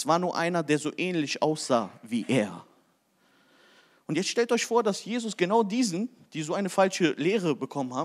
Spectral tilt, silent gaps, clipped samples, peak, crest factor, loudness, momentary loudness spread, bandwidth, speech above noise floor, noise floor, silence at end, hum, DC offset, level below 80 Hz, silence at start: -4.5 dB/octave; none; under 0.1%; -10 dBFS; 18 dB; -27 LUFS; 9 LU; 15 kHz; 40 dB; -67 dBFS; 0 s; none; under 0.1%; -86 dBFS; 0 s